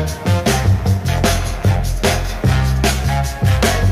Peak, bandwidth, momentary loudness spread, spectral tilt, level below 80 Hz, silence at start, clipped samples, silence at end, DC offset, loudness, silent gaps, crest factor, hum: -2 dBFS; 16 kHz; 3 LU; -5 dB/octave; -22 dBFS; 0 s; under 0.1%; 0 s; under 0.1%; -16 LUFS; none; 14 dB; none